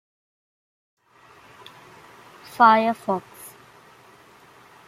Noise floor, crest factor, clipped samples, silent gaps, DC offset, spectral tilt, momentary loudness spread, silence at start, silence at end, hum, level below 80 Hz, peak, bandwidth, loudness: -53 dBFS; 24 dB; under 0.1%; none; under 0.1%; -5 dB/octave; 27 LU; 2.6 s; 1.4 s; none; -74 dBFS; -2 dBFS; 16 kHz; -19 LUFS